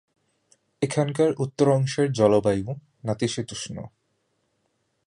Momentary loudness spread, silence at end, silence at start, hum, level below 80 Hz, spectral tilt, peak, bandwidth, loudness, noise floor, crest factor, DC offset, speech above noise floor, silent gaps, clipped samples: 15 LU; 1.2 s; 0.8 s; none; -56 dBFS; -6 dB/octave; -6 dBFS; 11.5 kHz; -24 LUFS; -73 dBFS; 20 dB; under 0.1%; 49 dB; none; under 0.1%